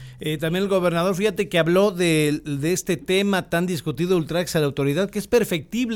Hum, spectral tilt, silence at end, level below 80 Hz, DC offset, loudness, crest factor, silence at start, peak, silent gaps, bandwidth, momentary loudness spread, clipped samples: none; -5.5 dB/octave; 0 s; -50 dBFS; under 0.1%; -22 LUFS; 16 dB; 0 s; -6 dBFS; none; 17.5 kHz; 6 LU; under 0.1%